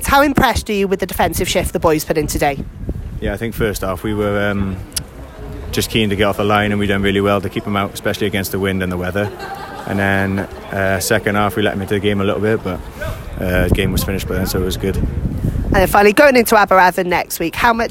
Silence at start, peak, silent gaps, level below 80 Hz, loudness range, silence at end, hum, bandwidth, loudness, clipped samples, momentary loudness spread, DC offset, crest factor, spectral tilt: 0 s; 0 dBFS; none; -30 dBFS; 6 LU; 0 s; none; 16.5 kHz; -16 LUFS; under 0.1%; 13 LU; under 0.1%; 16 dB; -5 dB/octave